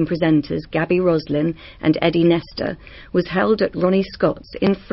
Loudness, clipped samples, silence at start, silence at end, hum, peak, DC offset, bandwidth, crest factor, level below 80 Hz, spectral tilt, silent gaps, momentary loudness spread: -19 LUFS; under 0.1%; 0 s; 0 s; none; -4 dBFS; 0.1%; 5.8 kHz; 16 dB; -46 dBFS; -10 dB/octave; none; 7 LU